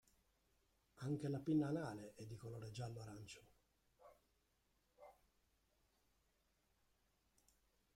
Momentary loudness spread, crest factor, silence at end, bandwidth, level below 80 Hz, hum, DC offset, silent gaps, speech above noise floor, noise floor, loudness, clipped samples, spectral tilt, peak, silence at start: 26 LU; 22 dB; 2.85 s; 15.5 kHz; -78 dBFS; none; under 0.1%; none; 37 dB; -83 dBFS; -47 LUFS; under 0.1%; -7 dB/octave; -30 dBFS; 0.95 s